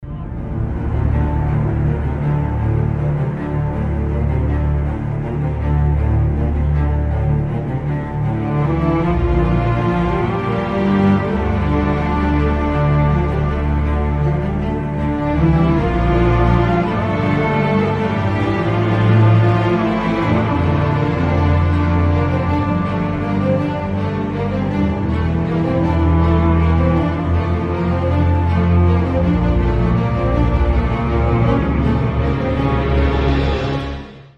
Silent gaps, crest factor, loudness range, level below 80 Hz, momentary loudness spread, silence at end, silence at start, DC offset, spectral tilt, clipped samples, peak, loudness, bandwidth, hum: none; 14 dB; 3 LU; -22 dBFS; 6 LU; 0.15 s; 0 s; under 0.1%; -9.5 dB/octave; under 0.1%; -2 dBFS; -17 LUFS; 6.6 kHz; none